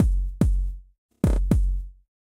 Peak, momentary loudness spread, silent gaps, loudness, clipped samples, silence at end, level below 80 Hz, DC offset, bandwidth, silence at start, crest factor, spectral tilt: -8 dBFS; 14 LU; 0.98-1.09 s; -26 LUFS; under 0.1%; 0.3 s; -24 dBFS; under 0.1%; 12 kHz; 0 s; 16 dB; -8.5 dB/octave